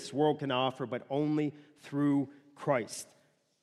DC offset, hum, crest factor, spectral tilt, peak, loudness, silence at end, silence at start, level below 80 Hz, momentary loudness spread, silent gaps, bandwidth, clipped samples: under 0.1%; none; 16 dB; -6 dB/octave; -16 dBFS; -33 LUFS; 0.6 s; 0 s; -82 dBFS; 12 LU; none; 12.5 kHz; under 0.1%